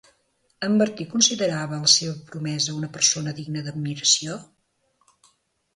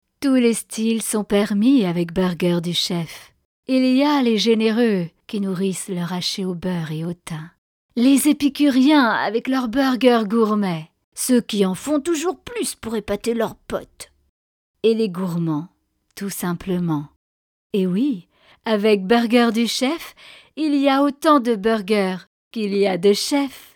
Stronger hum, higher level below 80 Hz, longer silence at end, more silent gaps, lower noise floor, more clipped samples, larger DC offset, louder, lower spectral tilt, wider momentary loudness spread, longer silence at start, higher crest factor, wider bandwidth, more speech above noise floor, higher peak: neither; second, -66 dBFS vs -54 dBFS; first, 1.3 s vs 0.15 s; second, none vs 3.45-3.63 s, 7.58-7.89 s, 11.04-11.12 s, 14.29-14.74 s, 17.16-17.70 s, 22.27-22.51 s; second, -68 dBFS vs under -90 dBFS; neither; neither; about the same, -22 LUFS vs -20 LUFS; second, -2.5 dB/octave vs -5 dB/octave; about the same, 14 LU vs 13 LU; first, 0.6 s vs 0.2 s; about the same, 22 dB vs 18 dB; second, 11.5 kHz vs 18.5 kHz; second, 45 dB vs over 71 dB; about the same, -2 dBFS vs -2 dBFS